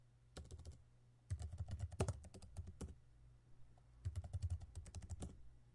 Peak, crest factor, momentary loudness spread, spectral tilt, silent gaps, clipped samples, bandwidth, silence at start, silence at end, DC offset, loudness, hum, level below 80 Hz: -26 dBFS; 24 dB; 23 LU; -6 dB/octave; none; under 0.1%; 11.5 kHz; 0 s; 0 s; under 0.1%; -51 LUFS; none; -58 dBFS